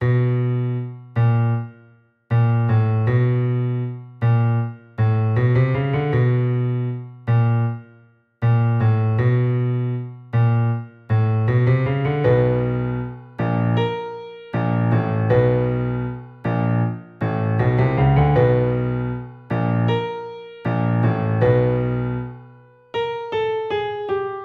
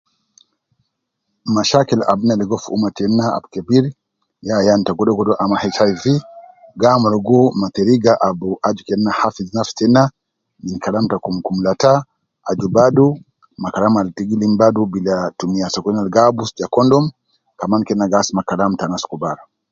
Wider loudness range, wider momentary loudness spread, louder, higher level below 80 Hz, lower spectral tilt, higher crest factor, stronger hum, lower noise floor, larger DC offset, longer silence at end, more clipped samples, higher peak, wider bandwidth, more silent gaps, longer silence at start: about the same, 2 LU vs 2 LU; about the same, 11 LU vs 10 LU; second, -20 LUFS vs -16 LUFS; first, -42 dBFS vs -52 dBFS; first, -10.5 dB/octave vs -6 dB/octave; about the same, 16 dB vs 16 dB; neither; second, -53 dBFS vs -73 dBFS; neither; second, 0 s vs 0.35 s; neither; second, -4 dBFS vs 0 dBFS; second, 4.3 kHz vs 7.6 kHz; neither; second, 0 s vs 1.45 s